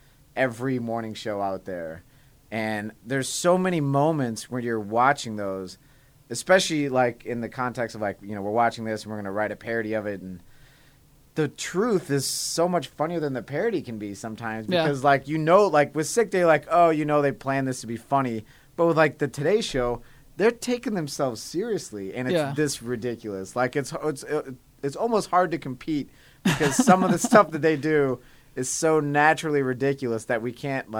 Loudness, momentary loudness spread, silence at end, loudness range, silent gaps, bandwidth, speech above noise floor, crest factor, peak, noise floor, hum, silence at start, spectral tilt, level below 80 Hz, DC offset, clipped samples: -25 LUFS; 13 LU; 0 s; 7 LU; none; 19.5 kHz; 31 dB; 22 dB; -2 dBFS; -56 dBFS; none; 0.35 s; -5 dB/octave; -56 dBFS; under 0.1%; under 0.1%